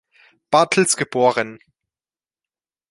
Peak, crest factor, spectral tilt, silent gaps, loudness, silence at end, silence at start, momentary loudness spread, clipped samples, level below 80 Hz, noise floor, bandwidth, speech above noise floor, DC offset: -2 dBFS; 20 dB; -3 dB/octave; none; -18 LUFS; 1.35 s; 0.5 s; 8 LU; under 0.1%; -64 dBFS; under -90 dBFS; 11.5 kHz; over 72 dB; under 0.1%